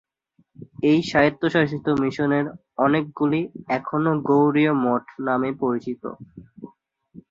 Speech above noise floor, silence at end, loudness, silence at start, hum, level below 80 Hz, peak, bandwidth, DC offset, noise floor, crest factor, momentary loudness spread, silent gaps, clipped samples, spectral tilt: 43 dB; 0.1 s; -22 LUFS; 0.6 s; none; -58 dBFS; -4 dBFS; 7.6 kHz; under 0.1%; -65 dBFS; 20 dB; 10 LU; none; under 0.1%; -7.5 dB/octave